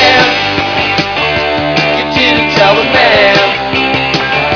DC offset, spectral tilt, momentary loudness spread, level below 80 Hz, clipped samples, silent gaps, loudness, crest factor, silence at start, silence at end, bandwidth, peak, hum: under 0.1%; -4.5 dB/octave; 5 LU; -34 dBFS; 0.2%; none; -9 LUFS; 10 dB; 0 s; 0 s; 5.4 kHz; 0 dBFS; none